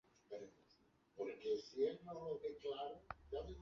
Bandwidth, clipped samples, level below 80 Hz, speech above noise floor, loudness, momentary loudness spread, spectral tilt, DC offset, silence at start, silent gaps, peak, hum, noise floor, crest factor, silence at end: 7.2 kHz; under 0.1%; -66 dBFS; 29 dB; -47 LUFS; 13 LU; -4.5 dB/octave; under 0.1%; 0.3 s; none; -28 dBFS; none; -75 dBFS; 18 dB; 0 s